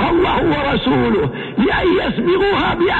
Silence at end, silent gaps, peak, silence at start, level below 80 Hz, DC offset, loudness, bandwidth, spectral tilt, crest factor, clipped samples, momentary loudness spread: 0 s; none; -4 dBFS; 0 s; -34 dBFS; under 0.1%; -16 LUFS; 7.6 kHz; -8 dB/octave; 10 dB; under 0.1%; 3 LU